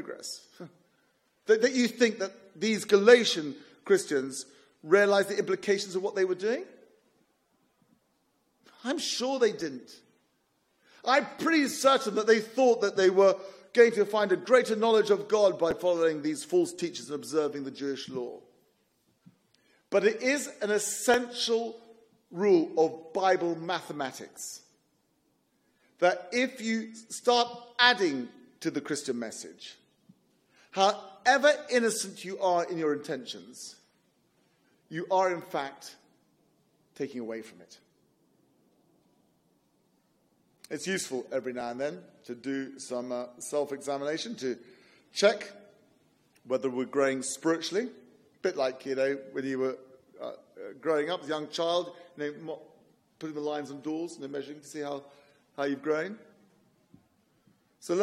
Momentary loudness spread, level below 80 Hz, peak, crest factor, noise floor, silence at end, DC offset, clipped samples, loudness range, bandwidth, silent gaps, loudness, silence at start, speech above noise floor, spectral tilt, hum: 18 LU; -78 dBFS; -4 dBFS; 26 dB; -73 dBFS; 0 s; under 0.1%; under 0.1%; 12 LU; 15.5 kHz; none; -28 LUFS; 0 s; 45 dB; -3.5 dB/octave; none